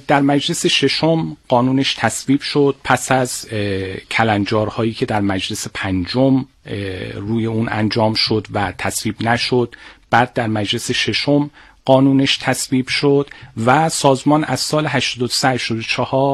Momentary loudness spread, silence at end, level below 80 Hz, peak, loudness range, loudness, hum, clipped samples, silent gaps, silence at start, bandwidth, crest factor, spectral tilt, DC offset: 8 LU; 0 s; -48 dBFS; 0 dBFS; 3 LU; -17 LUFS; none; under 0.1%; none; 0.1 s; 13 kHz; 16 dB; -4.5 dB/octave; under 0.1%